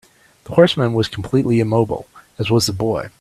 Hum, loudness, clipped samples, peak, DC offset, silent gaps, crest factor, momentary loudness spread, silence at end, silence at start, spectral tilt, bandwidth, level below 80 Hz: none; -17 LUFS; under 0.1%; 0 dBFS; under 0.1%; none; 18 dB; 8 LU; 0.1 s; 0.5 s; -6 dB/octave; 14 kHz; -48 dBFS